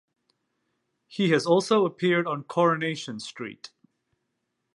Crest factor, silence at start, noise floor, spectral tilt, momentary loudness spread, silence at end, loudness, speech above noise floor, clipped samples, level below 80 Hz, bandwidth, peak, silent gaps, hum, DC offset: 20 dB; 1.1 s; -79 dBFS; -5.5 dB/octave; 17 LU; 1.05 s; -24 LUFS; 54 dB; under 0.1%; -78 dBFS; 11.5 kHz; -8 dBFS; none; none; under 0.1%